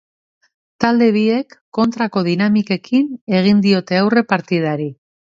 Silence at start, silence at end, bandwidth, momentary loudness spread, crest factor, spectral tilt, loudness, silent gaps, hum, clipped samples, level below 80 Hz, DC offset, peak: 0.8 s; 0.45 s; 7.4 kHz; 7 LU; 16 dB; -7 dB/octave; -16 LUFS; 1.61-1.72 s, 3.21-3.27 s; none; under 0.1%; -58 dBFS; under 0.1%; 0 dBFS